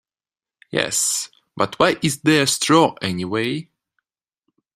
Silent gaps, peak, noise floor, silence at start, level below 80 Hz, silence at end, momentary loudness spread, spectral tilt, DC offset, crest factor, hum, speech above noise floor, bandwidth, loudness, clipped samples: none; 0 dBFS; under -90 dBFS; 0.75 s; -60 dBFS; 1.15 s; 10 LU; -3.5 dB/octave; under 0.1%; 22 dB; none; over 71 dB; 15.5 kHz; -19 LUFS; under 0.1%